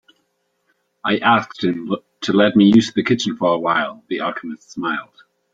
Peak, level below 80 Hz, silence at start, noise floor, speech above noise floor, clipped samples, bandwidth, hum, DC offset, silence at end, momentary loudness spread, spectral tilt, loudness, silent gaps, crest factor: 0 dBFS; -60 dBFS; 1.05 s; -68 dBFS; 51 dB; under 0.1%; 7.8 kHz; none; under 0.1%; 0.5 s; 14 LU; -5.5 dB/octave; -18 LUFS; none; 18 dB